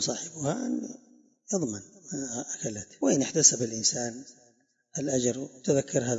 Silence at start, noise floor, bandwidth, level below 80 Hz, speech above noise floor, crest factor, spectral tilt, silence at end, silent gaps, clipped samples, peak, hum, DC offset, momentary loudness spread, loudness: 0 s; -66 dBFS; 8 kHz; -70 dBFS; 37 dB; 24 dB; -3.5 dB/octave; 0 s; none; under 0.1%; -6 dBFS; none; under 0.1%; 16 LU; -28 LUFS